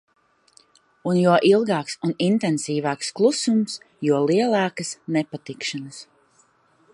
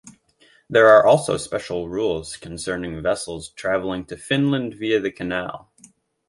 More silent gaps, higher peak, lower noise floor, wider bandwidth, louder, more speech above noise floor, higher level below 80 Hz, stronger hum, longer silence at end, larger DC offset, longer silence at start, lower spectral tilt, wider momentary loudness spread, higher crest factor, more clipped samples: neither; about the same, -4 dBFS vs -2 dBFS; about the same, -60 dBFS vs -57 dBFS; about the same, 11.5 kHz vs 11.5 kHz; about the same, -22 LUFS vs -20 LUFS; about the same, 39 dB vs 37 dB; second, -74 dBFS vs -50 dBFS; neither; first, 0.9 s vs 0.7 s; neither; first, 1.05 s vs 0.05 s; about the same, -5 dB/octave vs -5 dB/octave; second, 13 LU vs 17 LU; about the same, 18 dB vs 20 dB; neither